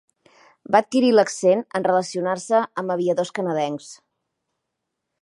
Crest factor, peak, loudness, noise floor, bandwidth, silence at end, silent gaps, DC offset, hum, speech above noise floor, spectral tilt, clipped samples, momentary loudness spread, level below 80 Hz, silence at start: 20 dB; -2 dBFS; -21 LUFS; -80 dBFS; 11.5 kHz; 1.25 s; none; under 0.1%; none; 60 dB; -5 dB/octave; under 0.1%; 8 LU; -76 dBFS; 0.7 s